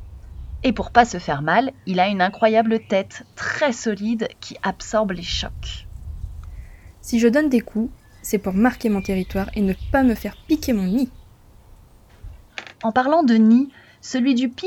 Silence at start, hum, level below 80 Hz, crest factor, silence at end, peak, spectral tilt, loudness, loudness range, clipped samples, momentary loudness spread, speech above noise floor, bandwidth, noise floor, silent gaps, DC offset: 0 s; none; -40 dBFS; 20 dB; 0 s; 0 dBFS; -5.5 dB/octave; -20 LUFS; 5 LU; under 0.1%; 19 LU; 29 dB; 17 kHz; -48 dBFS; none; under 0.1%